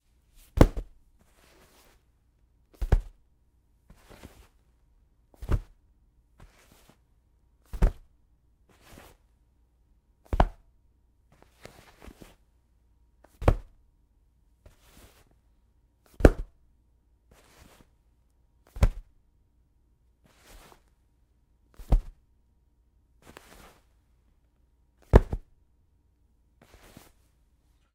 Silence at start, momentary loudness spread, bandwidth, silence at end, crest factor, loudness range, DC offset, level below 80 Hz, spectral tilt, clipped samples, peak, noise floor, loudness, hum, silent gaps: 0.55 s; 30 LU; 15 kHz; 2.55 s; 32 dB; 8 LU; under 0.1%; -34 dBFS; -7.5 dB/octave; under 0.1%; 0 dBFS; -66 dBFS; -28 LUFS; none; none